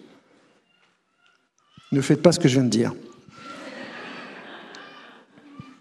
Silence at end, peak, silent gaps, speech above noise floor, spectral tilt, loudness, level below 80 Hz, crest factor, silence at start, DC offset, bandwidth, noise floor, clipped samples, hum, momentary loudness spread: 0.95 s; 0 dBFS; none; 45 dB; -5.5 dB/octave; -21 LUFS; -66 dBFS; 26 dB; 1.9 s; under 0.1%; 13 kHz; -65 dBFS; under 0.1%; none; 27 LU